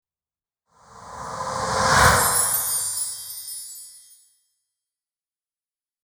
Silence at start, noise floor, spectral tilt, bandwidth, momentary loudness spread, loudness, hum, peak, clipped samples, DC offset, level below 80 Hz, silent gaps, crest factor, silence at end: 0.95 s; under -90 dBFS; -2 dB/octave; over 20 kHz; 21 LU; -20 LUFS; none; -2 dBFS; under 0.1%; under 0.1%; -42 dBFS; none; 24 dB; 2.1 s